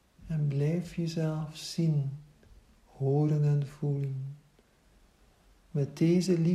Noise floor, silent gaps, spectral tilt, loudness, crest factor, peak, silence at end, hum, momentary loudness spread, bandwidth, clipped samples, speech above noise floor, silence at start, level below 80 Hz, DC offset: -64 dBFS; none; -7.5 dB/octave; -30 LUFS; 14 dB; -16 dBFS; 0 s; none; 11 LU; 12 kHz; under 0.1%; 35 dB; 0.2 s; -62 dBFS; under 0.1%